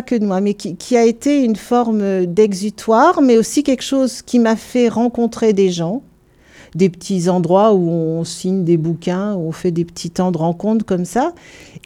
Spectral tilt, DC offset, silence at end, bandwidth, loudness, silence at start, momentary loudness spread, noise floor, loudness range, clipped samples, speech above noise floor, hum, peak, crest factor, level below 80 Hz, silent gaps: -6 dB/octave; under 0.1%; 0.05 s; 15.5 kHz; -16 LUFS; 0 s; 8 LU; -48 dBFS; 4 LU; under 0.1%; 33 dB; none; -2 dBFS; 14 dB; -52 dBFS; none